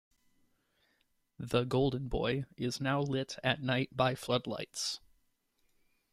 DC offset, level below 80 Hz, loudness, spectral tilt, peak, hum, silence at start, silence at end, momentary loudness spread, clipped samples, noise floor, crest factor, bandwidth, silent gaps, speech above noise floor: under 0.1%; -54 dBFS; -34 LUFS; -5 dB/octave; -14 dBFS; none; 1.4 s; 1.15 s; 7 LU; under 0.1%; -76 dBFS; 22 dB; 15 kHz; none; 42 dB